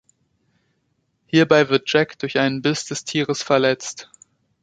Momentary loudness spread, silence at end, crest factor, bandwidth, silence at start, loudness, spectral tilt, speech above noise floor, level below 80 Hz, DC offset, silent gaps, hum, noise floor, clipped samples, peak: 10 LU; 0.6 s; 20 dB; 9.4 kHz; 1.35 s; -19 LUFS; -4.5 dB/octave; 50 dB; -62 dBFS; under 0.1%; none; none; -69 dBFS; under 0.1%; -2 dBFS